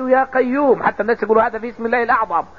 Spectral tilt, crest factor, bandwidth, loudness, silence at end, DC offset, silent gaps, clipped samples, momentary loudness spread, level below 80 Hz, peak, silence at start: -7.5 dB/octave; 14 dB; 6.6 kHz; -17 LUFS; 0.15 s; 0.5%; none; under 0.1%; 5 LU; -50 dBFS; -2 dBFS; 0 s